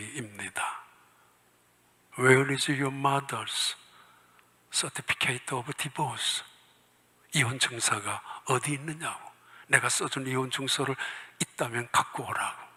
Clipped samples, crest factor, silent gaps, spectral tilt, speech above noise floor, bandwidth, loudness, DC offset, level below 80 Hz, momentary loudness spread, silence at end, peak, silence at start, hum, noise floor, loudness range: under 0.1%; 28 dB; none; -3 dB/octave; 35 dB; 16 kHz; -29 LUFS; under 0.1%; -72 dBFS; 12 LU; 0.05 s; -4 dBFS; 0 s; none; -65 dBFS; 3 LU